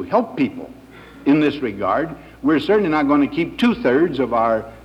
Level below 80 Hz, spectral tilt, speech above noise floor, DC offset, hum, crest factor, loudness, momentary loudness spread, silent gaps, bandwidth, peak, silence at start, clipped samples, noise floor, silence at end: -48 dBFS; -7.5 dB/octave; 23 dB; under 0.1%; none; 16 dB; -19 LUFS; 7 LU; none; 8.8 kHz; -2 dBFS; 0 s; under 0.1%; -41 dBFS; 0.05 s